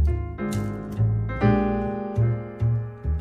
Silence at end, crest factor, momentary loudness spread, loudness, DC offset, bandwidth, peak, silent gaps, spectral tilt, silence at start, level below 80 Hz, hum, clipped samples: 0 s; 16 dB; 7 LU; -25 LUFS; under 0.1%; 10 kHz; -8 dBFS; none; -9 dB/octave; 0 s; -32 dBFS; none; under 0.1%